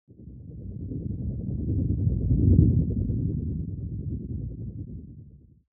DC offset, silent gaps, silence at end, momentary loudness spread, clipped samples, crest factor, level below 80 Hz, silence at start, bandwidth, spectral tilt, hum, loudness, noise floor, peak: under 0.1%; none; 0.35 s; 21 LU; under 0.1%; 22 dB; -34 dBFS; 0.1 s; 0.9 kHz; -20 dB/octave; none; -27 LUFS; -49 dBFS; -6 dBFS